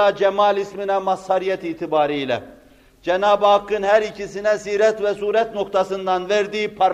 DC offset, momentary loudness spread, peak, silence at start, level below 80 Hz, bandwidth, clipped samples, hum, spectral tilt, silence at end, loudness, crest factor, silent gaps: under 0.1%; 7 LU; -4 dBFS; 0 s; -56 dBFS; 10 kHz; under 0.1%; none; -4.5 dB/octave; 0 s; -20 LUFS; 16 dB; none